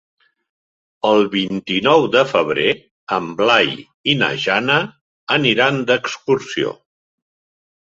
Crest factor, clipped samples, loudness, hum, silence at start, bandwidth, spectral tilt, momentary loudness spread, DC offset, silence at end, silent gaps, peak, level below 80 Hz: 18 dB; under 0.1%; -17 LUFS; none; 1.05 s; 7.8 kHz; -5 dB/octave; 9 LU; under 0.1%; 1.1 s; 2.91-3.07 s, 3.94-4.04 s, 5.01-5.27 s; 0 dBFS; -58 dBFS